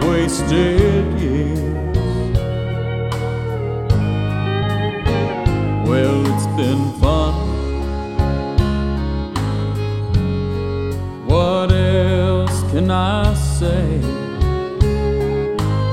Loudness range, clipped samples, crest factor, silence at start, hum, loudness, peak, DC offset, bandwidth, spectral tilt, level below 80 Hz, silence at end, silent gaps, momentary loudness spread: 3 LU; under 0.1%; 16 dB; 0 s; none; -18 LUFS; 0 dBFS; under 0.1%; 13.5 kHz; -7 dB/octave; -26 dBFS; 0 s; none; 7 LU